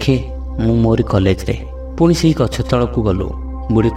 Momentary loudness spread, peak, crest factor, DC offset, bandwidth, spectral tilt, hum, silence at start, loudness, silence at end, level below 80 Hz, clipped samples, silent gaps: 11 LU; 0 dBFS; 14 dB; under 0.1%; 14 kHz; -7 dB/octave; none; 0 s; -16 LUFS; 0 s; -26 dBFS; under 0.1%; none